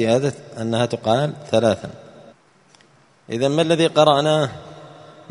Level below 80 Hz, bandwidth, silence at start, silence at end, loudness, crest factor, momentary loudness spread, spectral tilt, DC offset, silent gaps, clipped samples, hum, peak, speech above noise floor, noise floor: -58 dBFS; 11 kHz; 0 s; 0.4 s; -19 LUFS; 20 dB; 15 LU; -5.5 dB/octave; under 0.1%; none; under 0.1%; none; 0 dBFS; 36 dB; -54 dBFS